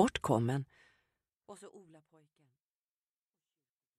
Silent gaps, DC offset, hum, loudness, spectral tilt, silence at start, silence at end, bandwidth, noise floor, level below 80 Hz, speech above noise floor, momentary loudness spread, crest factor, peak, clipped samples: none; under 0.1%; none; -33 LUFS; -6 dB/octave; 0 s; 2.2 s; 13.5 kHz; under -90 dBFS; -66 dBFS; over 55 dB; 24 LU; 26 dB; -14 dBFS; under 0.1%